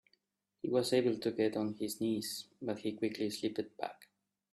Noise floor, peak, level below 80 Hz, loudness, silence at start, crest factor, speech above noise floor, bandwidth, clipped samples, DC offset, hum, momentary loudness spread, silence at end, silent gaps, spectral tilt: -78 dBFS; -18 dBFS; -78 dBFS; -36 LUFS; 0.65 s; 18 dB; 42 dB; 15 kHz; under 0.1%; under 0.1%; none; 11 LU; 0.5 s; none; -5 dB/octave